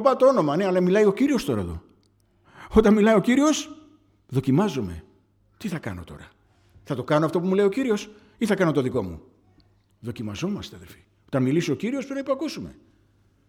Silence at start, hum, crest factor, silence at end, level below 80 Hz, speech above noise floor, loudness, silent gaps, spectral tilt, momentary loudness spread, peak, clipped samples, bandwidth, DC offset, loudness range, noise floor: 0 s; none; 22 dB; 0.75 s; -48 dBFS; 40 dB; -23 LUFS; none; -6.5 dB/octave; 19 LU; -2 dBFS; under 0.1%; 16 kHz; under 0.1%; 8 LU; -62 dBFS